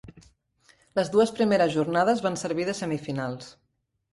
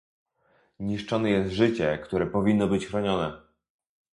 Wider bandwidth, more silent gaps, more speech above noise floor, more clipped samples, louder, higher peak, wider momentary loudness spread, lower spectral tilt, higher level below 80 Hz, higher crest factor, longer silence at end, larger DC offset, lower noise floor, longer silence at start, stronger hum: about the same, 11.5 kHz vs 11 kHz; neither; about the same, 38 dB vs 41 dB; neither; about the same, -25 LUFS vs -26 LUFS; about the same, -10 dBFS vs -8 dBFS; about the same, 10 LU vs 9 LU; second, -5.5 dB/octave vs -7 dB/octave; second, -62 dBFS vs -52 dBFS; about the same, 18 dB vs 18 dB; about the same, 0.65 s vs 0.75 s; neither; about the same, -63 dBFS vs -66 dBFS; second, 0.05 s vs 0.8 s; neither